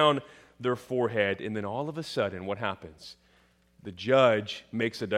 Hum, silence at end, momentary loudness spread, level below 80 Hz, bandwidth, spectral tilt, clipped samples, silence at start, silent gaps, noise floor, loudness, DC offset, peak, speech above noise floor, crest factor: none; 0 s; 21 LU; -68 dBFS; 13.5 kHz; -5.5 dB/octave; under 0.1%; 0 s; none; -64 dBFS; -29 LUFS; under 0.1%; -8 dBFS; 36 dB; 22 dB